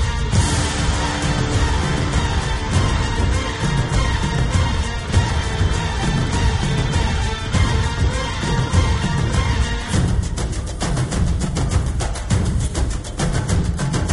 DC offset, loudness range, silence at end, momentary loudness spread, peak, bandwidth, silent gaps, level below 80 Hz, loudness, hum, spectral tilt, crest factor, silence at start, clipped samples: under 0.1%; 2 LU; 0 s; 4 LU; -4 dBFS; 11.5 kHz; none; -22 dBFS; -20 LUFS; none; -5 dB/octave; 14 dB; 0 s; under 0.1%